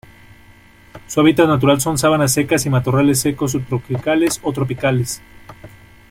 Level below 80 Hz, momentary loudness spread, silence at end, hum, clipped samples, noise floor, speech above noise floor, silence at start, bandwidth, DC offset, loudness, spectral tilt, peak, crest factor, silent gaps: -46 dBFS; 9 LU; 0.45 s; none; under 0.1%; -46 dBFS; 30 dB; 0.95 s; 16.5 kHz; under 0.1%; -16 LUFS; -5 dB/octave; -2 dBFS; 16 dB; none